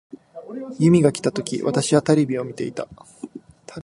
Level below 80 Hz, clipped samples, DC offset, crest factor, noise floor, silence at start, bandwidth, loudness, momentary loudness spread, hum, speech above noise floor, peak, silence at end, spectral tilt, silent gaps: -58 dBFS; under 0.1%; under 0.1%; 20 dB; -42 dBFS; 0.35 s; 11.5 kHz; -20 LUFS; 22 LU; none; 22 dB; -2 dBFS; 0 s; -6 dB/octave; none